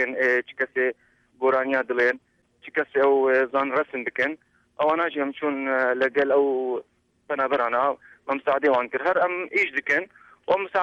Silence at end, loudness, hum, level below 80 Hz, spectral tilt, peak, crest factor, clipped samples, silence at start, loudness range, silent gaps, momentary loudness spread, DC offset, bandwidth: 0 s; -24 LUFS; none; -70 dBFS; -5 dB/octave; -10 dBFS; 14 dB; under 0.1%; 0 s; 1 LU; none; 8 LU; under 0.1%; 7.4 kHz